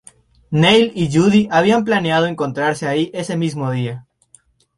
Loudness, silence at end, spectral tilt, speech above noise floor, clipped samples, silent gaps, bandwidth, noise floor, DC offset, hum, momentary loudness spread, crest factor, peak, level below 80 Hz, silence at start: -16 LUFS; 0.75 s; -6 dB/octave; 37 dB; under 0.1%; none; 11.5 kHz; -53 dBFS; under 0.1%; none; 10 LU; 16 dB; 0 dBFS; -52 dBFS; 0.5 s